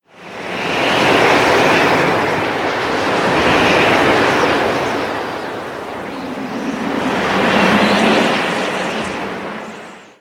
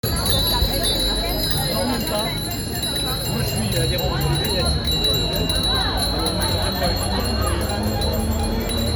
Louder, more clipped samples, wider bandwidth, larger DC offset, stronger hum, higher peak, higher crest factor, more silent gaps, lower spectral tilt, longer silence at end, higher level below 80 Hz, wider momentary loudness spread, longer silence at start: first, -15 LUFS vs -20 LUFS; neither; about the same, 18 kHz vs 19 kHz; neither; neither; first, 0 dBFS vs -4 dBFS; about the same, 16 dB vs 16 dB; neither; about the same, -4.5 dB/octave vs -4 dB/octave; first, 0.15 s vs 0 s; second, -44 dBFS vs -28 dBFS; first, 14 LU vs 4 LU; first, 0.2 s vs 0.05 s